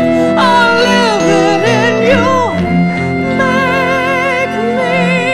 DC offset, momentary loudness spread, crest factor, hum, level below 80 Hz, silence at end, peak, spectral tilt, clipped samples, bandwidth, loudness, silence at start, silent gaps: under 0.1%; 5 LU; 10 dB; none; -42 dBFS; 0 s; 0 dBFS; -5.5 dB/octave; under 0.1%; 13 kHz; -11 LUFS; 0 s; none